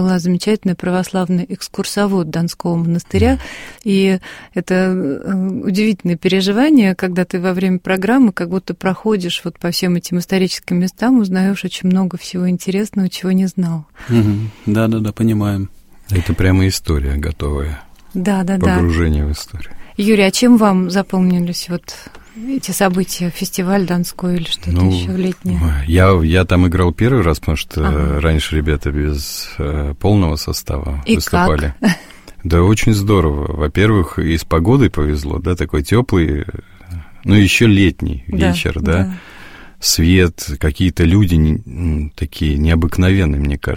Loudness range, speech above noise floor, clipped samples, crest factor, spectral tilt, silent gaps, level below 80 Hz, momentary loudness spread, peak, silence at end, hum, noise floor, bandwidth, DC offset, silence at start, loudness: 3 LU; 21 dB; under 0.1%; 14 dB; -6 dB/octave; none; -26 dBFS; 9 LU; 0 dBFS; 0 s; none; -36 dBFS; 16.5 kHz; under 0.1%; 0 s; -16 LUFS